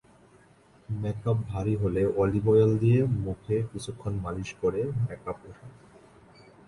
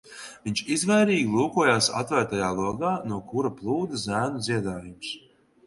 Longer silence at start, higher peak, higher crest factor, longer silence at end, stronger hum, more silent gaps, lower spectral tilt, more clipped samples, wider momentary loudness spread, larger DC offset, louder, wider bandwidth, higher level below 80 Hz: first, 0.9 s vs 0.05 s; second, -10 dBFS vs -6 dBFS; about the same, 18 dB vs 20 dB; first, 0.95 s vs 0.5 s; neither; neither; first, -8.5 dB/octave vs -4.5 dB/octave; neither; about the same, 14 LU vs 15 LU; neither; about the same, -27 LUFS vs -25 LUFS; about the same, 11 kHz vs 11.5 kHz; first, -48 dBFS vs -58 dBFS